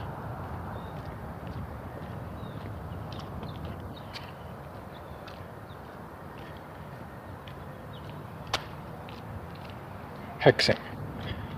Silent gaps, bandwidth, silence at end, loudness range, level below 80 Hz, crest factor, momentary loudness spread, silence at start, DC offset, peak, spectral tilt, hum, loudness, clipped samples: none; 15.5 kHz; 0 s; 13 LU; -50 dBFS; 30 dB; 14 LU; 0 s; under 0.1%; -4 dBFS; -5.5 dB/octave; none; -35 LUFS; under 0.1%